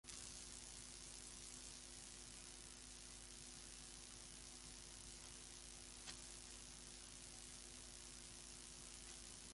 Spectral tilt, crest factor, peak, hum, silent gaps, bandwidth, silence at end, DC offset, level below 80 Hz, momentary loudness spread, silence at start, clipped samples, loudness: -1 dB/octave; 24 dB; -34 dBFS; none; none; 11.5 kHz; 0 s; under 0.1%; -66 dBFS; 2 LU; 0.05 s; under 0.1%; -55 LUFS